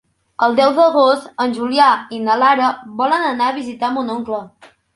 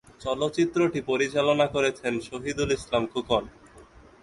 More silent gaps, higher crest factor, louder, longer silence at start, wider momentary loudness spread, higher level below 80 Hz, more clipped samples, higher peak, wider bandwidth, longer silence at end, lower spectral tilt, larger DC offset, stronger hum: neither; about the same, 16 dB vs 18 dB; first, -16 LUFS vs -26 LUFS; first, 0.4 s vs 0.2 s; about the same, 10 LU vs 8 LU; second, -62 dBFS vs -52 dBFS; neither; first, 0 dBFS vs -10 dBFS; about the same, 11.5 kHz vs 11.5 kHz; about the same, 0.45 s vs 0.4 s; about the same, -4.5 dB/octave vs -5 dB/octave; neither; neither